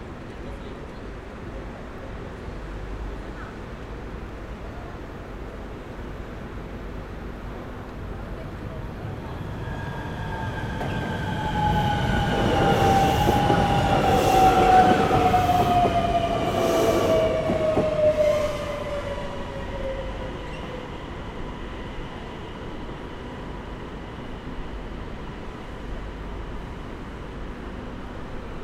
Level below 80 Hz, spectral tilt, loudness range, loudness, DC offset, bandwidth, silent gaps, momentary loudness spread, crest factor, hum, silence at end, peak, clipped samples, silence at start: -36 dBFS; -6 dB/octave; 17 LU; -24 LUFS; under 0.1%; 17 kHz; none; 17 LU; 22 dB; none; 0 s; -4 dBFS; under 0.1%; 0 s